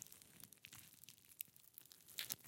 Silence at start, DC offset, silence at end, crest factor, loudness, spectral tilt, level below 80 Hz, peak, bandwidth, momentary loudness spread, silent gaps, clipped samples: 0 s; under 0.1%; 0 s; 36 dB; -55 LUFS; 0 dB/octave; under -90 dBFS; -20 dBFS; 17 kHz; 11 LU; none; under 0.1%